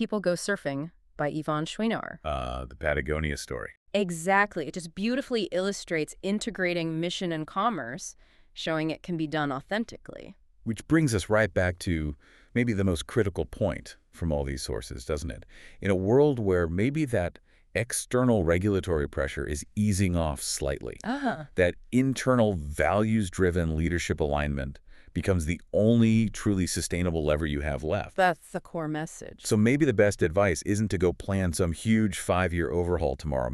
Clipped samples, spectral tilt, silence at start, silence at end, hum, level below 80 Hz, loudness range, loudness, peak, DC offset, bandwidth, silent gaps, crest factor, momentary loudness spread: under 0.1%; -5.5 dB/octave; 0 s; 0 s; none; -42 dBFS; 5 LU; -28 LUFS; -8 dBFS; under 0.1%; 13.5 kHz; 3.77-3.86 s; 18 dB; 11 LU